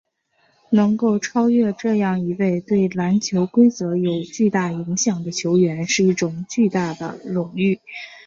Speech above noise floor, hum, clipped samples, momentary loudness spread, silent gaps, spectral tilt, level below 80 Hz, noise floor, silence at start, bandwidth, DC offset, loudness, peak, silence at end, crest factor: 44 dB; none; under 0.1%; 7 LU; none; -5.5 dB/octave; -60 dBFS; -63 dBFS; 0.7 s; 7.6 kHz; under 0.1%; -20 LUFS; -4 dBFS; 0.05 s; 16 dB